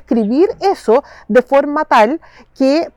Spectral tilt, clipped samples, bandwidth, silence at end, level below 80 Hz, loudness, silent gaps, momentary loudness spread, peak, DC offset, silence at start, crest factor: -6 dB/octave; under 0.1%; 12.5 kHz; 0.05 s; -50 dBFS; -14 LUFS; none; 5 LU; -2 dBFS; under 0.1%; 0.1 s; 12 dB